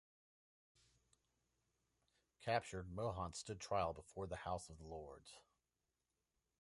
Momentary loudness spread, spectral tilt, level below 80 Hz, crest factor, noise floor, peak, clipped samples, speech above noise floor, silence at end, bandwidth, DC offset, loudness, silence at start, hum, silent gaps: 15 LU; -4.5 dB/octave; -66 dBFS; 26 dB; under -90 dBFS; -24 dBFS; under 0.1%; over 44 dB; 1.2 s; 11.5 kHz; under 0.1%; -46 LUFS; 2.4 s; none; none